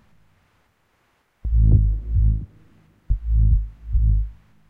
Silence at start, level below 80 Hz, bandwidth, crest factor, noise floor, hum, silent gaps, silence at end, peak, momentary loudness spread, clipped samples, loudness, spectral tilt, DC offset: 1.45 s; -22 dBFS; 0.8 kHz; 16 dB; -65 dBFS; none; none; 0.35 s; -4 dBFS; 13 LU; under 0.1%; -22 LUFS; -12 dB/octave; under 0.1%